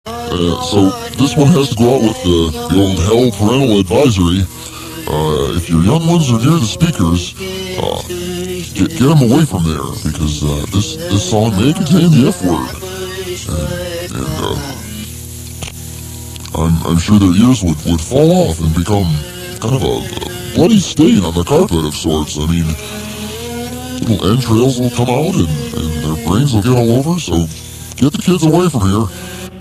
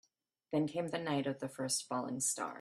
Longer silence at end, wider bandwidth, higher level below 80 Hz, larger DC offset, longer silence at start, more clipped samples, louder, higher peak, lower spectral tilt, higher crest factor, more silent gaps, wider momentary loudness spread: about the same, 0 s vs 0 s; about the same, 14 kHz vs 14 kHz; first, -30 dBFS vs -80 dBFS; neither; second, 0.05 s vs 0.5 s; neither; first, -13 LUFS vs -37 LUFS; first, 0 dBFS vs -22 dBFS; first, -6 dB/octave vs -3.5 dB/octave; about the same, 14 dB vs 16 dB; neither; first, 13 LU vs 4 LU